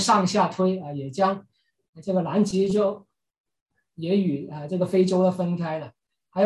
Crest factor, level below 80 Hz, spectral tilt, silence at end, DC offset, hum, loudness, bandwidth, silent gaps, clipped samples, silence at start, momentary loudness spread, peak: 18 dB; -66 dBFS; -6 dB/octave; 0 s; under 0.1%; none; -24 LUFS; 12 kHz; 1.89-1.93 s, 3.40-3.44 s, 3.61-3.66 s; under 0.1%; 0 s; 14 LU; -8 dBFS